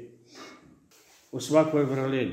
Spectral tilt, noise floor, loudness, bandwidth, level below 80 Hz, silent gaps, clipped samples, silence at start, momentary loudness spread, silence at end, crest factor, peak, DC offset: -6 dB/octave; -59 dBFS; -25 LUFS; 15.5 kHz; -70 dBFS; none; under 0.1%; 0 s; 25 LU; 0 s; 20 dB; -8 dBFS; under 0.1%